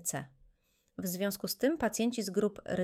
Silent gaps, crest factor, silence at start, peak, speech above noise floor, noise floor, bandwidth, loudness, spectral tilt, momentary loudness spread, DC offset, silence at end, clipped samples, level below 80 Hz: none; 18 dB; 0 s; -16 dBFS; 38 dB; -71 dBFS; 17 kHz; -34 LUFS; -4 dB/octave; 11 LU; under 0.1%; 0 s; under 0.1%; -64 dBFS